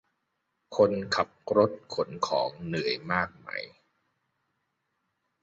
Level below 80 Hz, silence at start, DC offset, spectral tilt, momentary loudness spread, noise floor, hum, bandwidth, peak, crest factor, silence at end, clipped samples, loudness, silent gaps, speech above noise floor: -62 dBFS; 0.7 s; under 0.1%; -5 dB/octave; 12 LU; -79 dBFS; none; 8 kHz; -8 dBFS; 22 dB; 1.75 s; under 0.1%; -29 LUFS; none; 51 dB